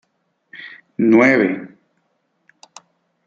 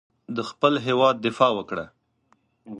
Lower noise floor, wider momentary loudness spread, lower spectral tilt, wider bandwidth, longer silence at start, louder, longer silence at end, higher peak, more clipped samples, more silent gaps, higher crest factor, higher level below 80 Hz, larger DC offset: about the same, -68 dBFS vs -66 dBFS; first, 24 LU vs 13 LU; about the same, -6.5 dB/octave vs -5.5 dB/octave; second, 7.6 kHz vs 10.5 kHz; first, 0.55 s vs 0.3 s; first, -15 LUFS vs -23 LUFS; first, 1.6 s vs 0 s; about the same, -2 dBFS vs -4 dBFS; neither; neither; about the same, 18 dB vs 22 dB; about the same, -66 dBFS vs -66 dBFS; neither